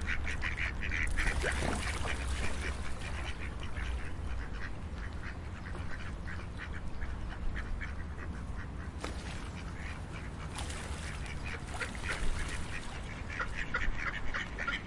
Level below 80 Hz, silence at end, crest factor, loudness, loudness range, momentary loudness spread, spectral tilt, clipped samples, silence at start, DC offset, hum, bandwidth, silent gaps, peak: -40 dBFS; 0 s; 18 dB; -39 LUFS; 6 LU; 8 LU; -4.5 dB/octave; under 0.1%; 0 s; under 0.1%; none; 11.5 kHz; none; -18 dBFS